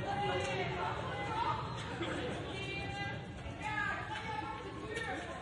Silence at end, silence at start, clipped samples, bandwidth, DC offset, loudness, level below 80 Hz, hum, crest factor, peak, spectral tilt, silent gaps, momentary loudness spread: 0 s; 0 s; under 0.1%; 11.5 kHz; under 0.1%; -39 LUFS; -56 dBFS; none; 16 dB; -22 dBFS; -5 dB/octave; none; 6 LU